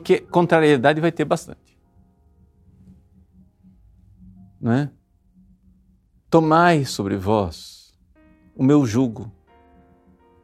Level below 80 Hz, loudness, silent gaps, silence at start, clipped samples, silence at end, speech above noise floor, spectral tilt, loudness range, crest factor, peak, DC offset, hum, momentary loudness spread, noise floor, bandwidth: -54 dBFS; -19 LUFS; none; 0 s; under 0.1%; 1.15 s; 40 dB; -6.5 dB/octave; 11 LU; 22 dB; 0 dBFS; under 0.1%; none; 17 LU; -58 dBFS; 14.5 kHz